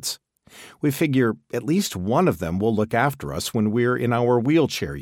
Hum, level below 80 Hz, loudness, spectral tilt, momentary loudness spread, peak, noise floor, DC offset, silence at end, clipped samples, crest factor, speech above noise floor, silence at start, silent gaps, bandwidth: none; -50 dBFS; -22 LUFS; -5.5 dB/octave; 7 LU; -6 dBFS; -48 dBFS; under 0.1%; 0 s; under 0.1%; 16 dB; 27 dB; 0 s; none; 17 kHz